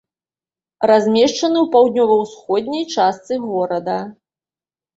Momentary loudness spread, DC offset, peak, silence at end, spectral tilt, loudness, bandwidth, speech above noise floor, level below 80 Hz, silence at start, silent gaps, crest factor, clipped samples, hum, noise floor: 10 LU; under 0.1%; -2 dBFS; 0.85 s; -4.5 dB/octave; -17 LUFS; 7.8 kHz; over 74 dB; -62 dBFS; 0.8 s; none; 16 dB; under 0.1%; none; under -90 dBFS